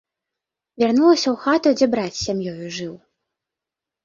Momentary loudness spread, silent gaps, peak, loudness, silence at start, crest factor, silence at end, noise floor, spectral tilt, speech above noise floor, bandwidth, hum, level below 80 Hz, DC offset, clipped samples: 14 LU; none; -4 dBFS; -19 LUFS; 0.8 s; 16 dB; 1.1 s; -87 dBFS; -4.5 dB/octave; 68 dB; 7.6 kHz; none; -56 dBFS; under 0.1%; under 0.1%